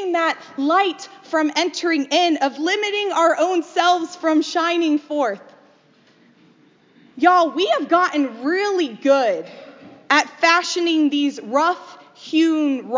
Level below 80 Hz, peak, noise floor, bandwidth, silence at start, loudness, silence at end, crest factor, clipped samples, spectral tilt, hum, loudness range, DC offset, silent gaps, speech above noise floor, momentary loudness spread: -78 dBFS; -2 dBFS; -55 dBFS; 7.6 kHz; 0 s; -19 LUFS; 0 s; 18 dB; under 0.1%; -2 dB/octave; none; 3 LU; under 0.1%; none; 36 dB; 7 LU